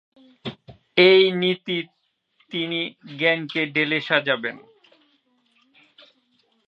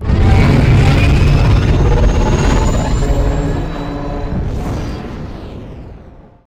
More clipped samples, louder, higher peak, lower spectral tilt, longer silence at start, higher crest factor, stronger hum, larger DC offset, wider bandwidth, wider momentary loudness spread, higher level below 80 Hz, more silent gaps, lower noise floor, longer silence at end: neither; second, -21 LUFS vs -14 LUFS; about the same, -2 dBFS vs -2 dBFS; about the same, -6.5 dB/octave vs -7 dB/octave; first, 0.45 s vs 0 s; first, 22 dB vs 10 dB; neither; neither; second, 5.8 kHz vs 10 kHz; first, 22 LU vs 17 LU; second, -70 dBFS vs -16 dBFS; neither; first, -66 dBFS vs -38 dBFS; first, 2.1 s vs 0.25 s